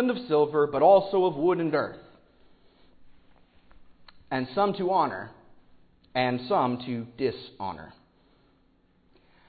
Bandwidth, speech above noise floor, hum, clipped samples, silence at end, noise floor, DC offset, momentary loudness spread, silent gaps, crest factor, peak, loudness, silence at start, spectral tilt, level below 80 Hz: 4.9 kHz; 39 dB; none; under 0.1%; 1.6 s; -64 dBFS; under 0.1%; 16 LU; none; 20 dB; -8 dBFS; -26 LUFS; 0 s; -10.5 dB/octave; -64 dBFS